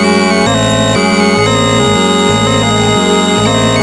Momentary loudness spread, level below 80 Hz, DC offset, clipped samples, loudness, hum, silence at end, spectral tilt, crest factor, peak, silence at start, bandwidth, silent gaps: 1 LU; -32 dBFS; under 0.1%; under 0.1%; -9 LUFS; none; 0 s; -4 dB/octave; 10 dB; 0 dBFS; 0 s; 11.5 kHz; none